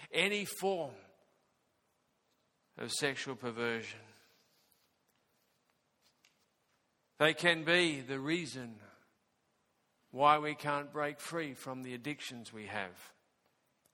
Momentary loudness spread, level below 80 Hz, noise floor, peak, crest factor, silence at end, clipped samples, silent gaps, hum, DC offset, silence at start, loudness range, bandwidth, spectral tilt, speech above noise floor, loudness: 17 LU; -82 dBFS; -78 dBFS; -10 dBFS; 28 dB; 0.85 s; under 0.1%; none; none; under 0.1%; 0 s; 8 LU; 17.5 kHz; -3.5 dB/octave; 43 dB; -34 LUFS